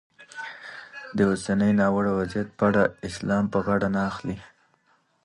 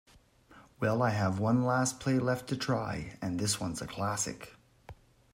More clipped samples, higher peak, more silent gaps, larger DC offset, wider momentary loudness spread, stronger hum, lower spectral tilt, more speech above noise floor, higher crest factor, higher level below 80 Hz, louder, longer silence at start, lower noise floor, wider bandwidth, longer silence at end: neither; first, -8 dBFS vs -14 dBFS; neither; neither; first, 17 LU vs 9 LU; neither; first, -7 dB/octave vs -5 dB/octave; first, 42 dB vs 29 dB; about the same, 18 dB vs 18 dB; first, -52 dBFS vs -62 dBFS; first, -24 LUFS vs -32 LUFS; second, 0.2 s vs 0.55 s; first, -66 dBFS vs -61 dBFS; second, 11 kHz vs 16 kHz; first, 0.8 s vs 0.4 s